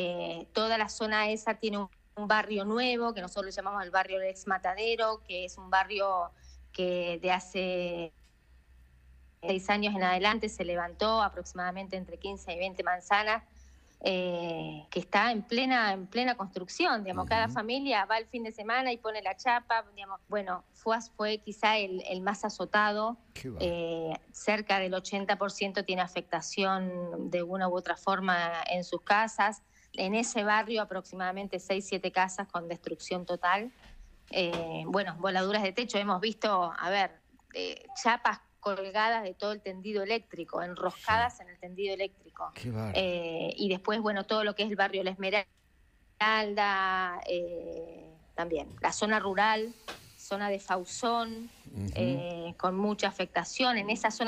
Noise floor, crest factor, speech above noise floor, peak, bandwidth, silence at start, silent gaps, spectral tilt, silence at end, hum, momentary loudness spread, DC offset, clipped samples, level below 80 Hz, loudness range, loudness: -64 dBFS; 20 dB; 33 dB; -12 dBFS; 15 kHz; 0 s; none; -4 dB/octave; 0 s; none; 11 LU; under 0.1%; under 0.1%; -60 dBFS; 3 LU; -31 LUFS